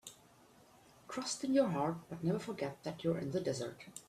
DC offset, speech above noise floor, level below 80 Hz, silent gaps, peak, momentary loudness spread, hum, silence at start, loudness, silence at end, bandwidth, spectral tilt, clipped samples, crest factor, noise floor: under 0.1%; 27 dB; -74 dBFS; none; -20 dBFS; 10 LU; none; 0.05 s; -38 LUFS; 0.05 s; 14.5 kHz; -5.5 dB/octave; under 0.1%; 20 dB; -64 dBFS